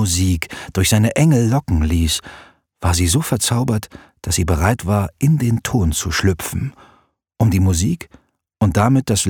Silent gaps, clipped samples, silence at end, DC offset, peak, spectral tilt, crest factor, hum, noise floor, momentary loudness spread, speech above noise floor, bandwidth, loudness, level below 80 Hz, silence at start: none; under 0.1%; 0 s; under 0.1%; 0 dBFS; -5 dB/octave; 16 dB; none; -56 dBFS; 9 LU; 39 dB; 19 kHz; -17 LUFS; -30 dBFS; 0 s